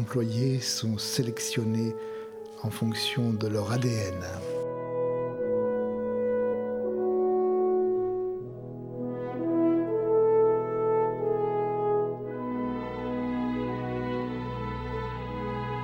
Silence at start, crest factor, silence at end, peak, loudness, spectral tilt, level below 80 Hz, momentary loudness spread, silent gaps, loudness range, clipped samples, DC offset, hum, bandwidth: 0 s; 14 dB; 0 s; -14 dBFS; -29 LUFS; -6 dB/octave; -52 dBFS; 9 LU; none; 4 LU; under 0.1%; under 0.1%; none; 17 kHz